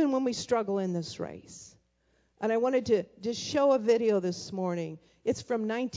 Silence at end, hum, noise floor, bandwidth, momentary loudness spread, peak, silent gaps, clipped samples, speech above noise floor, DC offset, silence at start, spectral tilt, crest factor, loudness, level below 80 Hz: 0 s; none; -71 dBFS; 7.8 kHz; 14 LU; -14 dBFS; none; under 0.1%; 42 dB; under 0.1%; 0 s; -5.5 dB/octave; 16 dB; -29 LUFS; -64 dBFS